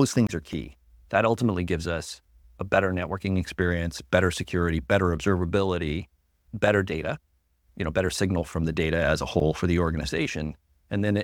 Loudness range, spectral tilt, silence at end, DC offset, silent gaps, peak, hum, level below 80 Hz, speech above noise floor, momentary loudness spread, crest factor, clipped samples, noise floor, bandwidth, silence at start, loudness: 2 LU; -6 dB/octave; 0 s; under 0.1%; none; -6 dBFS; none; -42 dBFS; 40 dB; 10 LU; 20 dB; under 0.1%; -65 dBFS; 16.5 kHz; 0 s; -26 LUFS